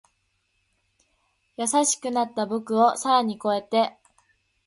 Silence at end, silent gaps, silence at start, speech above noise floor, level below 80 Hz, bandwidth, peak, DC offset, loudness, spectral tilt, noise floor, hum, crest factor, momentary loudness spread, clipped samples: 0.75 s; none; 1.6 s; 49 dB; -74 dBFS; 11.5 kHz; -6 dBFS; under 0.1%; -23 LUFS; -3 dB/octave; -72 dBFS; none; 20 dB; 7 LU; under 0.1%